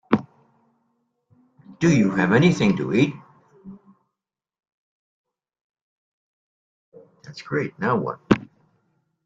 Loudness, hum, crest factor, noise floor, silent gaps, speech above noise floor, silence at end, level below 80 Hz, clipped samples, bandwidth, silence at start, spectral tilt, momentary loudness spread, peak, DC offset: -21 LUFS; none; 22 dB; -87 dBFS; 4.72-5.24 s, 5.61-5.70 s, 5.81-6.92 s; 67 dB; 0.8 s; -56 dBFS; under 0.1%; 7.8 kHz; 0.1 s; -6.5 dB/octave; 11 LU; -2 dBFS; under 0.1%